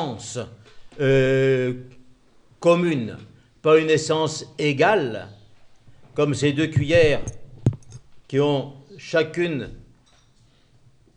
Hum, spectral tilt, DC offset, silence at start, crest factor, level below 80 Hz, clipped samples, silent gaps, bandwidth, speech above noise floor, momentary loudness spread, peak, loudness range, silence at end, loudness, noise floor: none; -6 dB/octave; under 0.1%; 0 s; 18 dB; -48 dBFS; under 0.1%; none; 10.5 kHz; 36 dB; 18 LU; -4 dBFS; 5 LU; 1.35 s; -21 LUFS; -57 dBFS